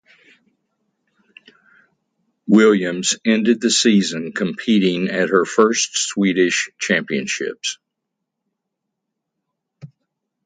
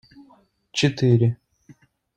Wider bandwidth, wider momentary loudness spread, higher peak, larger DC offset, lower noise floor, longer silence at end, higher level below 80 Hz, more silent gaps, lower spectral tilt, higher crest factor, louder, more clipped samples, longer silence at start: about the same, 9.6 kHz vs 9 kHz; about the same, 10 LU vs 12 LU; first, 0 dBFS vs -6 dBFS; neither; first, -79 dBFS vs -57 dBFS; second, 0.6 s vs 0.8 s; second, -66 dBFS vs -58 dBFS; neither; second, -3.5 dB/octave vs -6 dB/octave; about the same, 20 dB vs 18 dB; first, -17 LUFS vs -21 LUFS; neither; first, 2.45 s vs 0.75 s